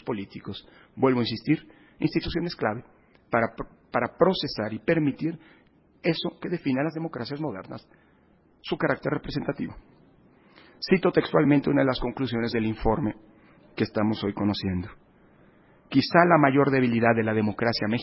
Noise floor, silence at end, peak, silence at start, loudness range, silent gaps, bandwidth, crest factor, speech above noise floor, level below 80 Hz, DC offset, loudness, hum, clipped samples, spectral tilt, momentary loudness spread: -60 dBFS; 0 s; -4 dBFS; 0.05 s; 8 LU; none; 5.8 kHz; 22 dB; 35 dB; -50 dBFS; under 0.1%; -25 LUFS; none; under 0.1%; -10.5 dB/octave; 16 LU